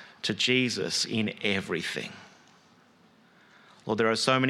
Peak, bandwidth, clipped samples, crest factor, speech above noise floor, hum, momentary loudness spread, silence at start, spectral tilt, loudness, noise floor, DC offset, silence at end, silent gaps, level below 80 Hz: -8 dBFS; 14.5 kHz; under 0.1%; 22 dB; 33 dB; none; 14 LU; 0 s; -3.5 dB/octave; -27 LUFS; -60 dBFS; under 0.1%; 0 s; none; -72 dBFS